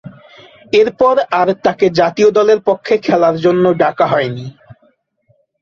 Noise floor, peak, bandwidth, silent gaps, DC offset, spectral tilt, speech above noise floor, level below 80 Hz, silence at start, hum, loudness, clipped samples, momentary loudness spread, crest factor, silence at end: -58 dBFS; 0 dBFS; 7.2 kHz; none; under 0.1%; -6 dB/octave; 46 dB; -54 dBFS; 0.05 s; none; -13 LUFS; under 0.1%; 5 LU; 14 dB; 1.1 s